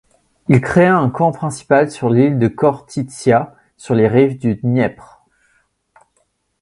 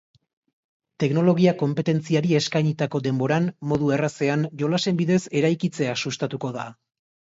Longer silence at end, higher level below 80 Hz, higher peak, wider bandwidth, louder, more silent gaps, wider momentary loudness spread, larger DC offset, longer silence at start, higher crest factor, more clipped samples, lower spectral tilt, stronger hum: first, 1.7 s vs 0.65 s; first, -48 dBFS vs -60 dBFS; first, 0 dBFS vs -6 dBFS; first, 11.5 kHz vs 8 kHz; first, -15 LUFS vs -23 LUFS; neither; about the same, 10 LU vs 8 LU; neither; second, 0.5 s vs 1 s; about the same, 16 dB vs 18 dB; neither; about the same, -7.5 dB/octave vs -6.5 dB/octave; neither